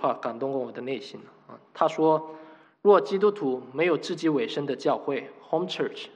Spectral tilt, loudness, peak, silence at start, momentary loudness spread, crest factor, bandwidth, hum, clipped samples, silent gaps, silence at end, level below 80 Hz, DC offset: -6 dB/octave; -26 LUFS; -6 dBFS; 0 s; 14 LU; 20 dB; 9 kHz; none; under 0.1%; none; 0.05 s; -84 dBFS; under 0.1%